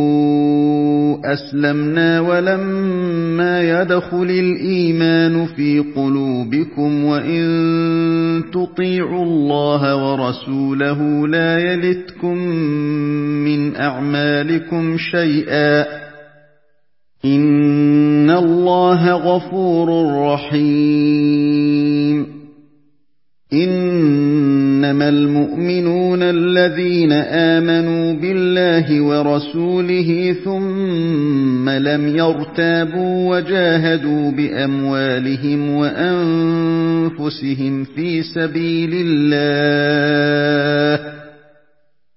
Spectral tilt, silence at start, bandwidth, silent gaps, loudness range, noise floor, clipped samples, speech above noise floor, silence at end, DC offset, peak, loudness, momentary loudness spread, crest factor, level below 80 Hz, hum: -11 dB/octave; 0 s; 5.8 kHz; none; 3 LU; -71 dBFS; under 0.1%; 56 dB; 0.85 s; 0.2%; 0 dBFS; -16 LUFS; 6 LU; 14 dB; -60 dBFS; none